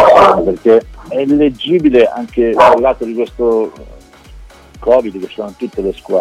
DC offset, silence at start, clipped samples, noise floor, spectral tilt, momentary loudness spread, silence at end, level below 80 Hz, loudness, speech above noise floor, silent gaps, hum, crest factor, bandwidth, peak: under 0.1%; 0 s; under 0.1%; -36 dBFS; -6.5 dB/octave; 14 LU; 0 s; -38 dBFS; -12 LUFS; 24 dB; none; none; 12 dB; 12.5 kHz; 0 dBFS